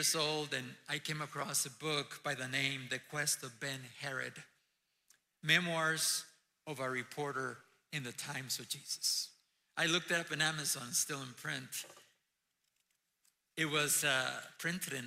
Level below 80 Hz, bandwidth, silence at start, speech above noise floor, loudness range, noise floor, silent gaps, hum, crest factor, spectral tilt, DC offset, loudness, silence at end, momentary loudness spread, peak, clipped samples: -82 dBFS; 16 kHz; 0 s; 46 dB; 4 LU; -84 dBFS; none; none; 24 dB; -2 dB/octave; under 0.1%; -36 LUFS; 0 s; 13 LU; -14 dBFS; under 0.1%